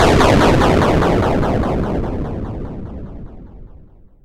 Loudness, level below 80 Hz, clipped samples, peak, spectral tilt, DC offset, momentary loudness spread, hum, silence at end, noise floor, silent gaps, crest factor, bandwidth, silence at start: -15 LUFS; -26 dBFS; under 0.1%; -4 dBFS; -6.5 dB/octave; under 0.1%; 20 LU; none; 0.55 s; -42 dBFS; none; 12 dB; 16 kHz; 0 s